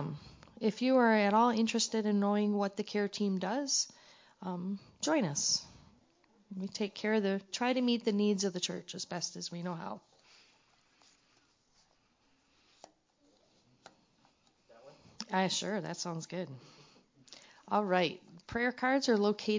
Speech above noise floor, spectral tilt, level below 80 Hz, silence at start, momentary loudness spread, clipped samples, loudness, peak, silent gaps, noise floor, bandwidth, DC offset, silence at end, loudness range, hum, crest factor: 40 dB; -4 dB/octave; -72 dBFS; 0 s; 15 LU; under 0.1%; -33 LUFS; -16 dBFS; none; -72 dBFS; 7.6 kHz; under 0.1%; 0 s; 12 LU; none; 20 dB